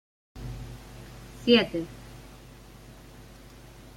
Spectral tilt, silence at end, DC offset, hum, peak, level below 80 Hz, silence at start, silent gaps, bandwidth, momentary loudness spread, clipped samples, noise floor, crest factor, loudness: -5.5 dB/octave; 0.05 s; under 0.1%; none; -6 dBFS; -50 dBFS; 0.35 s; none; 16.5 kHz; 27 LU; under 0.1%; -49 dBFS; 26 dB; -25 LUFS